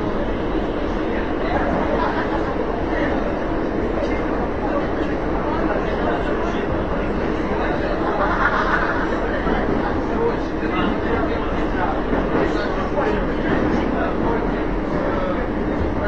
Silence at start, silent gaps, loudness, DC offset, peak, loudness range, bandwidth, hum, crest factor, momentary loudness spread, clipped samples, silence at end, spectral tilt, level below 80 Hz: 0 s; none; -21 LUFS; 2%; -4 dBFS; 2 LU; 8 kHz; none; 16 dB; 3 LU; under 0.1%; 0 s; -7.5 dB/octave; -30 dBFS